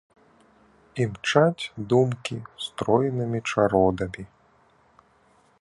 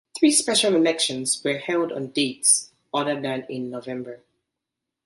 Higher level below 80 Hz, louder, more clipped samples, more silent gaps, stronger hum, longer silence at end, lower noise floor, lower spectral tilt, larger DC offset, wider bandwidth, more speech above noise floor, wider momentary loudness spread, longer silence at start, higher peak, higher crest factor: first, -52 dBFS vs -70 dBFS; about the same, -24 LUFS vs -22 LUFS; neither; neither; neither; first, 1.35 s vs 0.9 s; second, -61 dBFS vs -84 dBFS; first, -6 dB/octave vs -2 dB/octave; neither; about the same, 11.5 kHz vs 12 kHz; second, 37 dB vs 62 dB; about the same, 13 LU vs 13 LU; first, 0.95 s vs 0.15 s; about the same, -4 dBFS vs -4 dBFS; about the same, 22 dB vs 20 dB